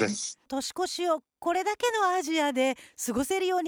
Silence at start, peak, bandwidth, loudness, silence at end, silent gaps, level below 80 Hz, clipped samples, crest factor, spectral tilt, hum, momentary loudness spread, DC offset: 0 s; -14 dBFS; over 20 kHz; -29 LUFS; 0 s; none; -64 dBFS; under 0.1%; 14 dB; -2.5 dB/octave; none; 8 LU; under 0.1%